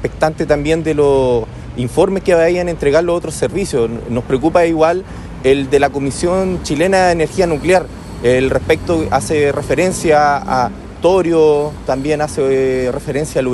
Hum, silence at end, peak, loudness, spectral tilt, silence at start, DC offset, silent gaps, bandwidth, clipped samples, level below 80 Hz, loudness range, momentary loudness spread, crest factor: none; 0 s; 0 dBFS; -15 LUFS; -5.5 dB/octave; 0 s; under 0.1%; none; 12.5 kHz; under 0.1%; -34 dBFS; 1 LU; 7 LU; 14 dB